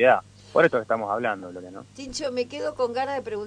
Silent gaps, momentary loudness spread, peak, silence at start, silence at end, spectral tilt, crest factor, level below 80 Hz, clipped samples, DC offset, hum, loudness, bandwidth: none; 18 LU; -6 dBFS; 0 s; 0 s; -4.5 dB/octave; 18 dB; -60 dBFS; under 0.1%; under 0.1%; 50 Hz at -55 dBFS; -25 LUFS; 10 kHz